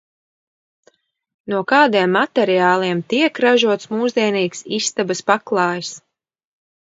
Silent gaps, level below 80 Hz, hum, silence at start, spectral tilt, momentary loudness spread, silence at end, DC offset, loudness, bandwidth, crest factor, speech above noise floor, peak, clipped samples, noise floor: none; -70 dBFS; none; 1.45 s; -4 dB/octave; 8 LU; 0.95 s; under 0.1%; -17 LUFS; 8 kHz; 18 dB; 42 dB; 0 dBFS; under 0.1%; -59 dBFS